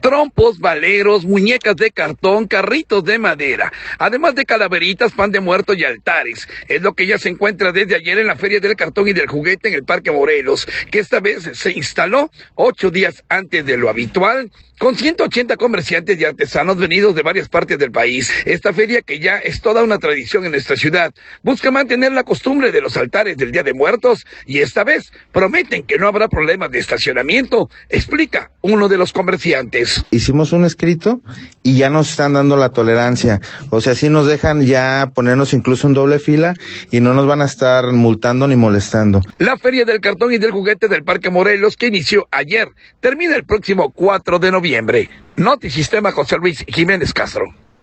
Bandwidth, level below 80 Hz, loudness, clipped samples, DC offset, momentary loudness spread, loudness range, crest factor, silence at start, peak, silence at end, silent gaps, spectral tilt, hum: 8.8 kHz; -42 dBFS; -14 LUFS; under 0.1%; under 0.1%; 5 LU; 2 LU; 12 dB; 0.05 s; -2 dBFS; 0.3 s; none; -5.5 dB/octave; none